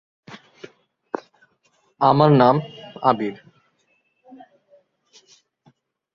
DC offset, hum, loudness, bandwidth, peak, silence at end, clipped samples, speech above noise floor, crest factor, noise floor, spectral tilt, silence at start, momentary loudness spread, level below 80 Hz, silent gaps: under 0.1%; none; -19 LUFS; 7 kHz; -2 dBFS; 2.8 s; under 0.1%; 50 dB; 22 dB; -67 dBFS; -8.5 dB/octave; 0.3 s; 19 LU; -64 dBFS; none